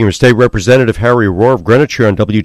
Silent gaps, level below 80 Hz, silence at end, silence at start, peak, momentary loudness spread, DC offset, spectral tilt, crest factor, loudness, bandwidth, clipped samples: none; -32 dBFS; 0 s; 0 s; 0 dBFS; 3 LU; under 0.1%; -6.5 dB/octave; 10 dB; -10 LUFS; 13.5 kHz; 1%